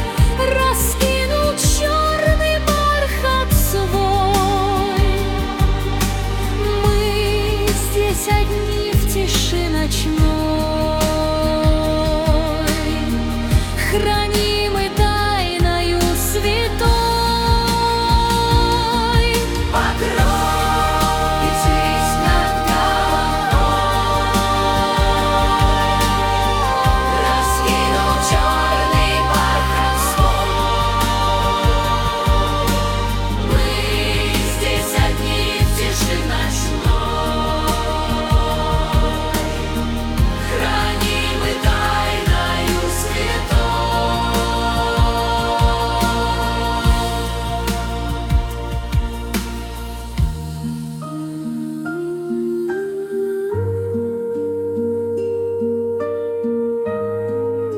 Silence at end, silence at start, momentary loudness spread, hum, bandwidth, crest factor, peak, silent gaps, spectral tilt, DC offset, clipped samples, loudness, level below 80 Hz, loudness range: 0 s; 0 s; 6 LU; none; 18 kHz; 16 dB; -2 dBFS; none; -4.5 dB/octave; under 0.1%; under 0.1%; -18 LUFS; -22 dBFS; 6 LU